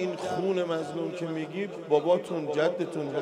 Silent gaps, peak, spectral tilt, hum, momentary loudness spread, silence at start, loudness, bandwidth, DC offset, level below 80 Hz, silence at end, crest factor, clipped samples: none; -10 dBFS; -6 dB/octave; none; 8 LU; 0 s; -29 LUFS; 11.5 kHz; under 0.1%; -76 dBFS; 0 s; 18 dB; under 0.1%